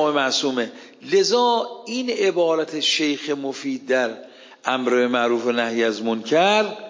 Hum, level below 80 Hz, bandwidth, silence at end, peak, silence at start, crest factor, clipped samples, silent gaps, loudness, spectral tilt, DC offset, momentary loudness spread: none; -80 dBFS; 7.6 kHz; 0 s; -4 dBFS; 0 s; 16 dB; under 0.1%; none; -21 LUFS; -3 dB/octave; under 0.1%; 10 LU